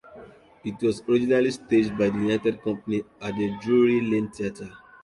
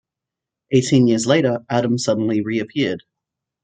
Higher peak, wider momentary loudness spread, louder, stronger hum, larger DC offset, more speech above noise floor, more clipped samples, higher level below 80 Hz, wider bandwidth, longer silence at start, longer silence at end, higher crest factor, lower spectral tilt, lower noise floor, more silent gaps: second, -10 dBFS vs -2 dBFS; first, 12 LU vs 7 LU; second, -24 LUFS vs -18 LUFS; neither; neither; second, 24 dB vs 68 dB; neither; about the same, -58 dBFS vs -62 dBFS; first, 11 kHz vs 9.4 kHz; second, 0.1 s vs 0.7 s; second, 0.25 s vs 0.65 s; about the same, 14 dB vs 18 dB; about the same, -6.5 dB/octave vs -5.5 dB/octave; second, -47 dBFS vs -85 dBFS; neither